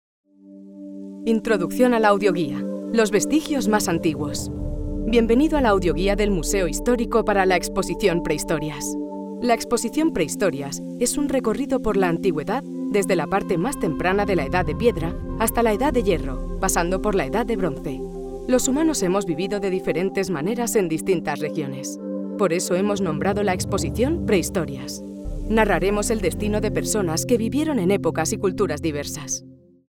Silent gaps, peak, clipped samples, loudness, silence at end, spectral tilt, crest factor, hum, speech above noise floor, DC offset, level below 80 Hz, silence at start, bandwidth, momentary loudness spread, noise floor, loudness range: none; -4 dBFS; under 0.1%; -22 LUFS; 0.35 s; -5 dB/octave; 18 dB; none; 23 dB; under 0.1%; -36 dBFS; 0.45 s; 18 kHz; 10 LU; -44 dBFS; 3 LU